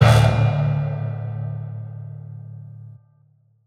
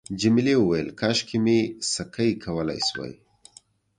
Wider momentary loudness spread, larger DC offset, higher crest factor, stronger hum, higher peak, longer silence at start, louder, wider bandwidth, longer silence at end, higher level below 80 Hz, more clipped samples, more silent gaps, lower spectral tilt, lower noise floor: first, 22 LU vs 8 LU; neither; about the same, 20 dB vs 16 dB; neither; first, -2 dBFS vs -8 dBFS; about the same, 0 s vs 0.1 s; first, -21 LUFS vs -24 LUFS; first, 13 kHz vs 10.5 kHz; about the same, 0.75 s vs 0.85 s; first, -38 dBFS vs -54 dBFS; neither; neither; first, -7 dB/octave vs -4.5 dB/octave; about the same, -58 dBFS vs -55 dBFS